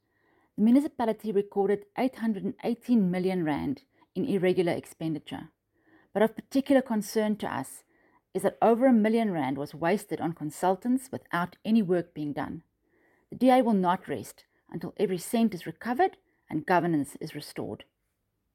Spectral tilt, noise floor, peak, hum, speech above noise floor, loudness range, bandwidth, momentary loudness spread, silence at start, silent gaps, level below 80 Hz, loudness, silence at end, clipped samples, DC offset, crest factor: -6.5 dB/octave; -78 dBFS; -10 dBFS; none; 51 dB; 3 LU; 16 kHz; 15 LU; 0.6 s; none; -68 dBFS; -28 LUFS; 0.7 s; under 0.1%; under 0.1%; 18 dB